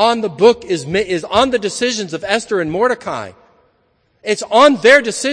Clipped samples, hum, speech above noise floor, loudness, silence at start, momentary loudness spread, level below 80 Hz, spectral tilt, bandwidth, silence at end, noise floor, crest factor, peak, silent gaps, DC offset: 0.2%; none; 46 dB; -14 LUFS; 0 s; 12 LU; -50 dBFS; -3.5 dB/octave; 11 kHz; 0 s; -60 dBFS; 16 dB; 0 dBFS; none; under 0.1%